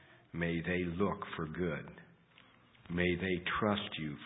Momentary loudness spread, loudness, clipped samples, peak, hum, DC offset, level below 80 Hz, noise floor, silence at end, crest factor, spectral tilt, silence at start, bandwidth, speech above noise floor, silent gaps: 9 LU; -36 LUFS; under 0.1%; -18 dBFS; none; under 0.1%; -56 dBFS; -64 dBFS; 0 s; 20 dB; -3.5 dB/octave; 0.1 s; 3.9 kHz; 28 dB; none